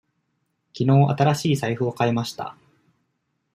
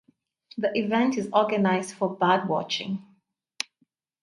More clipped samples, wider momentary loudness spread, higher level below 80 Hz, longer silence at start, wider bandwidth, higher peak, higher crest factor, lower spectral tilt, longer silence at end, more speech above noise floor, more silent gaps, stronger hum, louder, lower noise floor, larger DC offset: neither; about the same, 13 LU vs 13 LU; first, -62 dBFS vs -72 dBFS; first, 0.75 s vs 0.55 s; first, 15 kHz vs 11.5 kHz; about the same, -4 dBFS vs -6 dBFS; about the same, 20 dB vs 22 dB; first, -6.5 dB/octave vs -5 dB/octave; second, 1.05 s vs 1.2 s; first, 53 dB vs 47 dB; neither; neither; first, -21 LUFS vs -26 LUFS; about the same, -74 dBFS vs -71 dBFS; neither